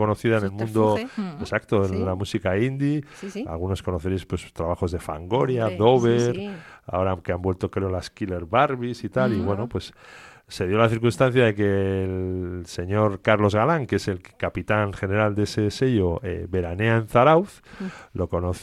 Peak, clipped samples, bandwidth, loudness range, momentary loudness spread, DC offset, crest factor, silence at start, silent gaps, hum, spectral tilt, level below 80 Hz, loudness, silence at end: -4 dBFS; under 0.1%; 13 kHz; 4 LU; 12 LU; under 0.1%; 20 dB; 0 s; none; none; -7 dB/octave; -46 dBFS; -23 LUFS; 0 s